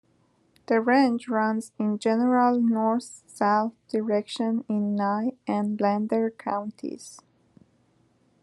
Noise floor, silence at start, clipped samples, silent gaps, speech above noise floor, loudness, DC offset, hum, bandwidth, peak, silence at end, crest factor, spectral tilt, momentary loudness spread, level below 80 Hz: -65 dBFS; 0.7 s; under 0.1%; none; 41 dB; -25 LUFS; under 0.1%; none; 11.5 kHz; -8 dBFS; 1.25 s; 18 dB; -6 dB/octave; 10 LU; -78 dBFS